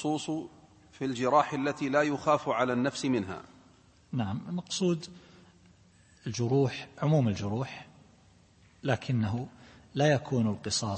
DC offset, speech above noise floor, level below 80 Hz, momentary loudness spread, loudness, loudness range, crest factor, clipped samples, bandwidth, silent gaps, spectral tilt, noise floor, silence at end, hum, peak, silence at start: under 0.1%; 31 dB; -64 dBFS; 13 LU; -30 LUFS; 5 LU; 20 dB; under 0.1%; 8.8 kHz; none; -5.5 dB/octave; -61 dBFS; 0 s; none; -10 dBFS; 0 s